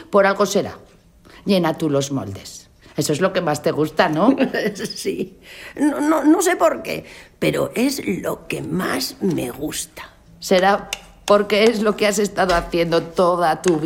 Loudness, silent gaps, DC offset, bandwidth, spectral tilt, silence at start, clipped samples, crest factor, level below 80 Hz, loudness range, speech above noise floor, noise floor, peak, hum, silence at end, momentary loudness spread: -19 LUFS; none; under 0.1%; 17 kHz; -4.5 dB/octave; 0 s; under 0.1%; 18 dB; -46 dBFS; 4 LU; 28 dB; -47 dBFS; 0 dBFS; none; 0 s; 15 LU